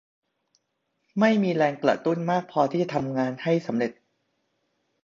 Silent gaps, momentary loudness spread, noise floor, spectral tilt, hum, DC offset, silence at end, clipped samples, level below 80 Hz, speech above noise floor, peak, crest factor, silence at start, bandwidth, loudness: none; 7 LU; -76 dBFS; -7 dB/octave; none; under 0.1%; 1.1 s; under 0.1%; -70 dBFS; 53 dB; -6 dBFS; 20 dB; 1.15 s; 7.4 kHz; -25 LUFS